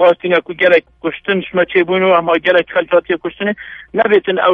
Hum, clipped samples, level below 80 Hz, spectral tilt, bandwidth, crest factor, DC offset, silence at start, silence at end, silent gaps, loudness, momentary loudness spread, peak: none; under 0.1%; -52 dBFS; -7 dB/octave; 5.2 kHz; 14 dB; under 0.1%; 0 s; 0 s; none; -14 LUFS; 8 LU; 0 dBFS